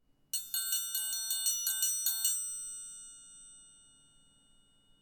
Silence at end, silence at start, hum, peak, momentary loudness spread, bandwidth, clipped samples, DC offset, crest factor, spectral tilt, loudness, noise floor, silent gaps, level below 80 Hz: 1.25 s; 0.35 s; none; -16 dBFS; 21 LU; 19.5 kHz; under 0.1%; under 0.1%; 22 dB; 4.5 dB/octave; -32 LUFS; -66 dBFS; none; -74 dBFS